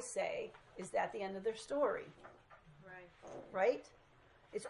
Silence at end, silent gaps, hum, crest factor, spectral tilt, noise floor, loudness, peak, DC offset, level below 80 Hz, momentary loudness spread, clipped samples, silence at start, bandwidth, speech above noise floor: 0 s; none; none; 20 dB; -4 dB/octave; -66 dBFS; -40 LUFS; -22 dBFS; under 0.1%; -74 dBFS; 20 LU; under 0.1%; 0 s; 11.5 kHz; 26 dB